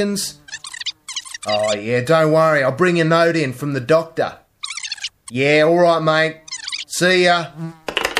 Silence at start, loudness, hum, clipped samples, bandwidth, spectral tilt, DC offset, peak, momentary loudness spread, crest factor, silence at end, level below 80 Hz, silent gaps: 0 s; -17 LUFS; none; under 0.1%; 15.5 kHz; -4.5 dB/octave; under 0.1%; 0 dBFS; 14 LU; 18 dB; 0 s; -58 dBFS; none